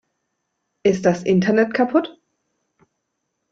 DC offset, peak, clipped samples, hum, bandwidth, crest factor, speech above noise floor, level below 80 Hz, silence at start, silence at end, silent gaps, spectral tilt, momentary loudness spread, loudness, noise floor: under 0.1%; -2 dBFS; under 0.1%; none; 7.8 kHz; 18 dB; 58 dB; -60 dBFS; 0.85 s; 1.4 s; none; -6.5 dB/octave; 5 LU; -19 LUFS; -76 dBFS